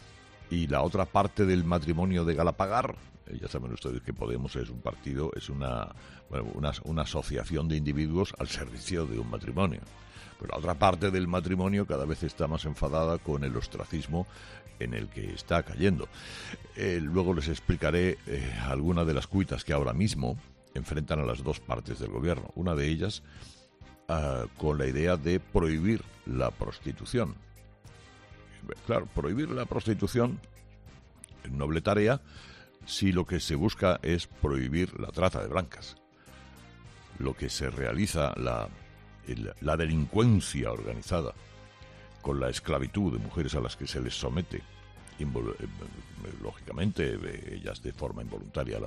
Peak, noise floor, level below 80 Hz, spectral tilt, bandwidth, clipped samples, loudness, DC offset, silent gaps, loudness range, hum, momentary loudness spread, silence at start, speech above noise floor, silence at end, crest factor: -10 dBFS; -54 dBFS; -44 dBFS; -6.5 dB/octave; 13.5 kHz; under 0.1%; -31 LUFS; under 0.1%; none; 5 LU; none; 15 LU; 0 s; 24 dB; 0 s; 22 dB